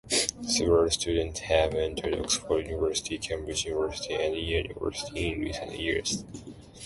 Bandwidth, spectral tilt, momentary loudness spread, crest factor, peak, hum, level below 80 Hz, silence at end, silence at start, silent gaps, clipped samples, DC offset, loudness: 11.5 kHz; -3 dB/octave; 9 LU; 22 dB; -8 dBFS; none; -44 dBFS; 0 s; 0.05 s; none; under 0.1%; under 0.1%; -28 LUFS